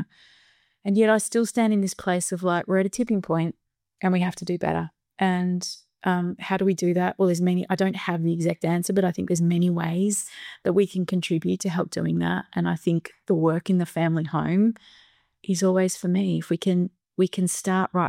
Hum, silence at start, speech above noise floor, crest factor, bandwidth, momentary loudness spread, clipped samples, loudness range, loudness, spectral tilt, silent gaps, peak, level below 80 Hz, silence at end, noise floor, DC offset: none; 0 s; 38 dB; 16 dB; 15.5 kHz; 6 LU; under 0.1%; 2 LU; -24 LUFS; -6 dB/octave; none; -8 dBFS; -62 dBFS; 0 s; -61 dBFS; under 0.1%